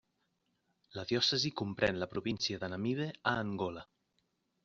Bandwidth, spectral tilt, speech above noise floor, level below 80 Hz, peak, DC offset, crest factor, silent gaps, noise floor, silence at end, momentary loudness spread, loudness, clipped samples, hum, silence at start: 7.6 kHz; -3 dB/octave; 45 dB; -66 dBFS; -14 dBFS; under 0.1%; 24 dB; none; -80 dBFS; 0.8 s; 10 LU; -35 LUFS; under 0.1%; none; 0.95 s